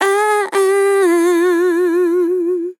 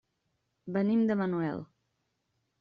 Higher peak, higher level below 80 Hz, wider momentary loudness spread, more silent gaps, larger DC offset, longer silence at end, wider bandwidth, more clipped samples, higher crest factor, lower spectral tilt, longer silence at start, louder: first, -2 dBFS vs -18 dBFS; second, under -90 dBFS vs -72 dBFS; second, 3 LU vs 14 LU; neither; neither; second, 0.05 s vs 0.95 s; first, 17 kHz vs 5.2 kHz; neither; about the same, 12 dB vs 14 dB; second, -1.5 dB/octave vs -8 dB/octave; second, 0 s vs 0.65 s; first, -14 LUFS vs -30 LUFS